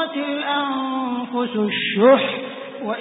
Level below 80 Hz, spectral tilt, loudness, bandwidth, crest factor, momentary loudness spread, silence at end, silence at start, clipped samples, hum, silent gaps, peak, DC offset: -70 dBFS; -10 dB/octave; -20 LUFS; 4 kHz; 18 dB; 14 LU; 0 s; 0 s; under 0.1%; none; none; -2 dBFS; under 0.1%